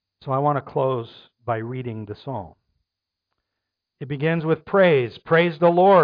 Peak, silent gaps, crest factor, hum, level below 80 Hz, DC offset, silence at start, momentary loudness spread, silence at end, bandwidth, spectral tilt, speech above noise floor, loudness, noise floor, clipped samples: -6 dBFS; none; 16 dB; none; -62 dBFS; under 0.1%; 0.25 s; 16 LU; 0 s; 5.2 kHz; -10 dB/octave; 63 dB; -21 LUFS; -83 dBFS; under 0.1%